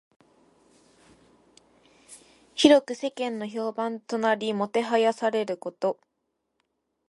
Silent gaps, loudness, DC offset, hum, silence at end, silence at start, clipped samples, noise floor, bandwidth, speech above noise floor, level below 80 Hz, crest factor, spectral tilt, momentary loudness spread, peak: none; -25 LUFS; under 0.1%; none; 1.15 s; 2.1 s; under 0.1%; -78 dBFS; 11.5 kHz; 54 dB; -72 dBFS; 26 dB; -4 dB/octave; 13 LU; -2 dBFS